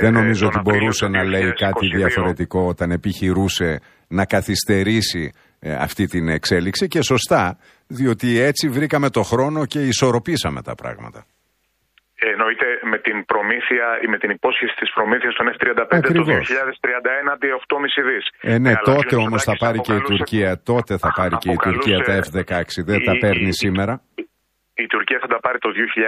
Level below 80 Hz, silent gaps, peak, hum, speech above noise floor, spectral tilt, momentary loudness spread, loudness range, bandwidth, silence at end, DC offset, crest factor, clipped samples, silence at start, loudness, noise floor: -44 dBFS; none; 0 dBFS; none; 49 dB; -5 dB/octave; 7 LU; 3 LU; 15.5 kHz; 0 s; under 0.1%; 18 dB; under 0.1%; 0 s; -18 LUFS; -67 dBFS